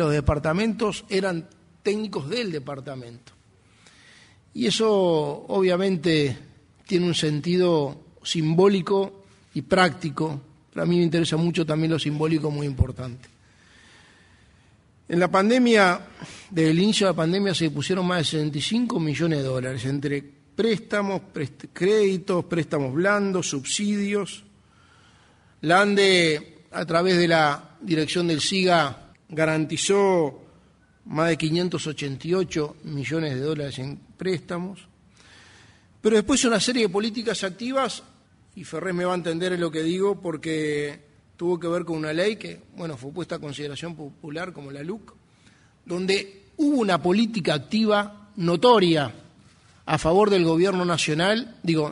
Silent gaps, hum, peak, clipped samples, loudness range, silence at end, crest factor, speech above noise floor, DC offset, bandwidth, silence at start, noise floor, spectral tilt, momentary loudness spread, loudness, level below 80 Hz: none; none; -4 dBFS; under 0.1%; 8 LU; 0 s; 20 dB; 34 dB; under 0.1%; 11 kHz; 0 s; -57 dBFS; -5 dB/octave; 15 LU; -23 LUFS; -48 dBFS